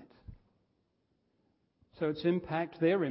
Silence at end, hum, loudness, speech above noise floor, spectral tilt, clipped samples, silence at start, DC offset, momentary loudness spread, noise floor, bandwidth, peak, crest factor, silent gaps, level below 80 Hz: 0 s; none; -33 LUFS; 46 dB; -6 dB/octave; under 0.1%; 0 s; under 0.1%; 6 LU; -77 dBFS; 5.6 kHz; -16 dBFS; 18 dB; none; -64 dBFS